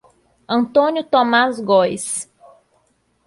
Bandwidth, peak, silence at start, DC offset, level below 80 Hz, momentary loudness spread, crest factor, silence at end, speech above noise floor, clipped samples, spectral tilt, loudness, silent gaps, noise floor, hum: 11.5 kHz; -2 dBFS; 0.5 s; under 0.1%; -62 dBFS; 10 LU; 16 dB; 1.05 s; 46 dB; under 0.1%; -3.5 dB/octave; -17 LUFS; none; -63 dBFS; none